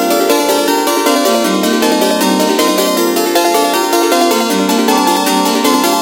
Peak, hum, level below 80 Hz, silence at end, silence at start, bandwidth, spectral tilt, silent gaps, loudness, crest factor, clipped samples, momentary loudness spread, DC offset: 0 dBFS; none; -60 dBFS; 0 s; 0 s; 17.5 kHz; -3 dB/octave; none; -11 LUFS; 12 dB; under 0.1%; 1 LU; under 0.1%